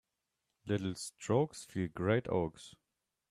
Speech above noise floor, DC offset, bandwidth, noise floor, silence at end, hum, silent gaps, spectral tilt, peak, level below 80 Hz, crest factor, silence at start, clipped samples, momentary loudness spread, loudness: 51 dB; under 0.1%; 13.5 kHz; -86 dBFS; 0.6 s; none; none; -6 dB/octave; -18 dBFS; -66 dBFS; 20 dB; 0.65 s; under 0.1%; 16 LU; -36 LUFS